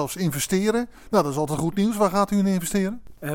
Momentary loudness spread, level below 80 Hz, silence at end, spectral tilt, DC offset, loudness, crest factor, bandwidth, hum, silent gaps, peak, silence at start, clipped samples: 5 LU; -48 dBFS; 0 s; -5.5 dB/octave; under 0.1%; -23 LUFS; 16 dB; 17.5 kHz; none; none; -6 dBFS; 0 s; under 0.1%